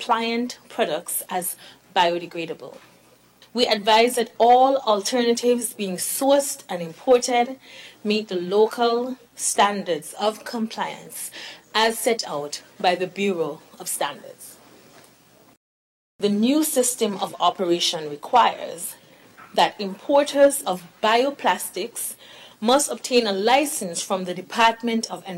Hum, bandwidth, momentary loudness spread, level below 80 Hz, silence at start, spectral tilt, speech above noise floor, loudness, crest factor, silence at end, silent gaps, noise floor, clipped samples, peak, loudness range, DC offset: none; 16.5 kHz; 13 LU; -68 dBFS; 0 s; -2.5 dB/octave; 33 dB; -22 LUFS; 18 dB; 0 s; 15.57-16.19 s; -55 dBFS; under 0.1%; -6 dBFS; 6 LU; under 0.1%